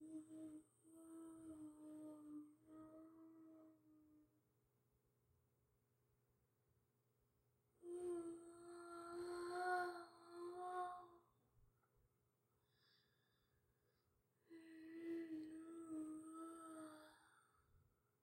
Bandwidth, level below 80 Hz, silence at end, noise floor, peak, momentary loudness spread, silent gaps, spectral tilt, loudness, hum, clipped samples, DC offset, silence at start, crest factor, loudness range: 16 kHz; -90 dBFS; 0.4 s; -85 dBFS; -32 dBFS; 16 LU; none; -4.5 dB/octave; -53 LUFS; none; under 0.1%; under 0.1%; 0 s; 24 dB; 13 LU